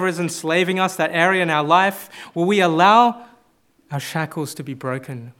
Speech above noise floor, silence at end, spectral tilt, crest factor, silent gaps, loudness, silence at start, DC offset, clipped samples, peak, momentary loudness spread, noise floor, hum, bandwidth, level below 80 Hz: 40 dB; 0.1 s; -4.5 dB/octave; 20 dB; none; -18 LUFS; 0 s; under 0.1%; under 0.1%; 0 dBFS; 16 LU; -59 dBFS; none; 17.5 kHz; -72 dBFS